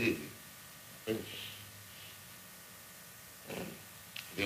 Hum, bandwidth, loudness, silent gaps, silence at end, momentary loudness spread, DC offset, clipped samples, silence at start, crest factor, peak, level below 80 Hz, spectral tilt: none; 15.5 kHz; -45 LUFS; none; 0 s; 11 LU; under 0.1%; under 0.1%; 0 s; 24 dB; -20 dBFS; -72 dBFS; -4 dB/octave